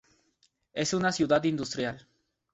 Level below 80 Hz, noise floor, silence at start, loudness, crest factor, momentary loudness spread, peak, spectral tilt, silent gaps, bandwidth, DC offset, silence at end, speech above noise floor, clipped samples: -64 dBFS; -71 dBFS; 0.75 s; -29 LUFS; 20 dB; 12 LU; -12 dBFS; -4.5 dB/octave; none; 8.4 kHz; under 0.1%; 0.55 s; 43 dB; under 0.1%